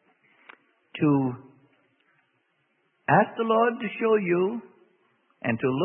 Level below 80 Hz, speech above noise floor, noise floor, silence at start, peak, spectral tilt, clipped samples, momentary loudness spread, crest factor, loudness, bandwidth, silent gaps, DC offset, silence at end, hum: -72 dBFS; 48 dB; -71 dBFS; 0.95 s; -8 dBFS; -11 dB/octave; under 0.1%; 14 LU; 20 dB; -25 LUFS; 3.7 kHz; none; under 0.1%; 0 s; none